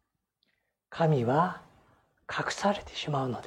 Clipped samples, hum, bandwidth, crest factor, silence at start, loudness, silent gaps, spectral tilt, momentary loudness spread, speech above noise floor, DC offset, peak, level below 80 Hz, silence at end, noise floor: under 0.1%; none; 11.5 kHz; 18 dB; 0.9 s; -29 LUFS; none; -6 dB/octave; 11 LU; 49 dB; under 0.1%; -14 dBFS; -62 dBFS; 0 s; -77 dBFS